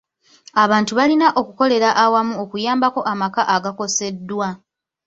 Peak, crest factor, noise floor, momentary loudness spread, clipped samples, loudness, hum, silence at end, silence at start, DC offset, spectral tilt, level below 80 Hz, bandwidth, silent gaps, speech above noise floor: -2 dBFS; 16 dB; -49 dBFS; 10 LU; under 0.1%; -18 LUFS; none; 0.5 s; 0.55 s; under 0.1%; -3.5 dB/octave; -62 dBFS; 8 kHz; none; 32 dB